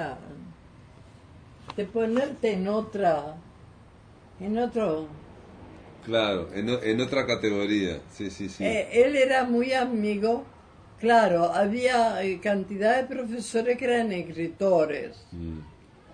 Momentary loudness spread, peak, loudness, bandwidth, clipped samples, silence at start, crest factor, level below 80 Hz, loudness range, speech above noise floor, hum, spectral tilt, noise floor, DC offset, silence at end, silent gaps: 16 LU; -8 dBFS; -26 LUFS; 10.5 kHz; under 0.1%; 0 s; 18 dB; -56 dBFS; 6 LU; 26 dB; none; -5.5 dB/octave; -52 dBFS; under 0.1%; 0.45 s; none